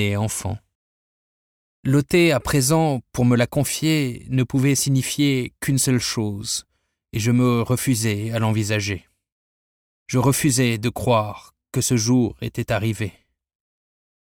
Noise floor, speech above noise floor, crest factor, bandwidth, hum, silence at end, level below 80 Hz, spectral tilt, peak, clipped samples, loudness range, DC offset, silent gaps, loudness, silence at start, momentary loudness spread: under -90 dBFS; over 70 dB; 16 dB; 17.5 kHz; none; 1.15 s; -48 dBFS; -5 dB/octave; -6 dBFS; under 0.1%; 3 LU; under 0.1%; 0.75-1.83 s, 9.32-10.06 s; -21 LUFS; 0 s; 10 LU